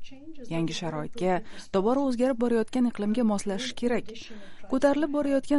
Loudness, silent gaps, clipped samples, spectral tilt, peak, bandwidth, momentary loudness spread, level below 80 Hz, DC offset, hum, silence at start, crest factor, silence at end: -27 LUFS; none; under 0.1%; -5.5 dB/octave; -10 dBFS; 11.5 kHz; 17 LU; -52 dBFS; under 0.1%; none; 0 s; 16 dB; 0 s